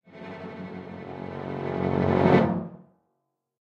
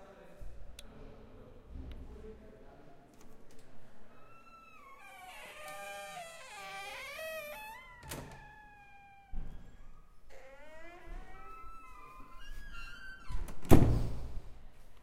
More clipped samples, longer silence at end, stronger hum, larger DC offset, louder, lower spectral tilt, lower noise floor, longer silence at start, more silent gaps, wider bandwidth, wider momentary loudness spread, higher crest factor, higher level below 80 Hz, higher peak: neither; first, 0.8 s vs 0 s; neither; neither; first, -25 LUFS vs -38 LUFS; first, -9 dB/octave vs -6.5 dB/octave; first, -78 dBFS vs -57 dBFS; about the same, 0.1 s vs 0 s; neither; second, 7 kHz vs 16 kHz; about the same, 19 LU vs 18 LU; second, 22 dB vs 32 dB; second, -58 dBFS vs -44 dBFS; about the same, -6 dBFS vs -4 dBFS